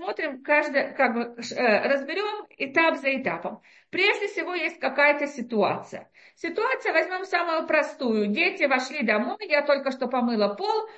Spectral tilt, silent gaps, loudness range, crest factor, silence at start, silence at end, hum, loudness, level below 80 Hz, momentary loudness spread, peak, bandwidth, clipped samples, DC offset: -4.5 dB/octave; none; 2 LU; 20 dB; 0 s; 0 s; none; -24 LUFS; -76 dBFS; 10 LU; -6 dBFS; 8.4 kHz; under 0.1%; under 0.1%